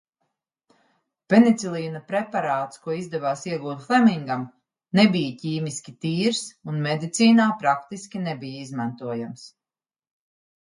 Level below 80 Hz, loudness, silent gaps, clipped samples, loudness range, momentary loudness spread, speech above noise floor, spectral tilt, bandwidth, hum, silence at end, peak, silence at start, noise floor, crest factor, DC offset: -70 dBFS; -23 LUFS; none; under 0.1%; 3 LU; 14 LU; over 67 dB; -5.5 dB/octave; 11 kHz; none; 1.2 s; -2 dBFS; 1.3 s; under -90 dBFS; 22 dB; under 0.1%